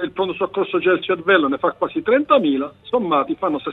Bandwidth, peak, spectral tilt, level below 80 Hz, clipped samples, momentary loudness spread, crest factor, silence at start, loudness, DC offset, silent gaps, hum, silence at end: 4.1 kHz; -2 dBFS; -8 dB/octave; -58 dBFS; under 0.1%; 7 LU; 18 dB; 0 s; -19 LUFS; under 0.1%; none; none; 0 s